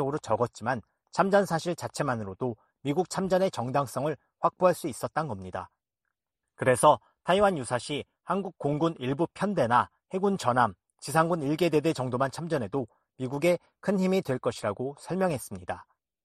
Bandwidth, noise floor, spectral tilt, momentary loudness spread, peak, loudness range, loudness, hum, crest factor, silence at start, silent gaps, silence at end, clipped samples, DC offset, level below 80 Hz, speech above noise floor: 13 kHz; -86 dBFS; -5.5 dB/octave; 11 LU; -8 dBFS; 3 LU; -28 LUFS; none; 20 dB; 0 s; none; 0.45 s; under 0.1%; under 0.1%; -62 dBFS; 58 dB